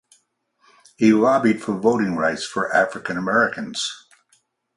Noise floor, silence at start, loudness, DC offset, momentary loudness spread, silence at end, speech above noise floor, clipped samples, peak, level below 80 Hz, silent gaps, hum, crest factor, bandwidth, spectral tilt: -65 dBFS; 1 s; -20 LUFS; under 0.1%; 10 LU; 0.8 s; 45 dB; under 0.1%; -4 dBFS; -62 dBFS; none; none; 18 dB; 11.5 kHz; -5 dB/octave